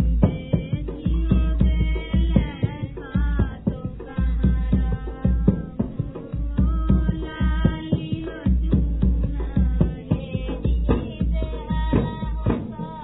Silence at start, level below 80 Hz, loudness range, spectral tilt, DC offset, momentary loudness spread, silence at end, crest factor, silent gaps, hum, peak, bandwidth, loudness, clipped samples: 0 s; -24 dBFS; 1 LU; -12 dB/octave; under 0.1%; 7 LU; 0 s; 18 dB; none; none; -2 dBFS; 4 kHz; -24 LUFS; under 0.1%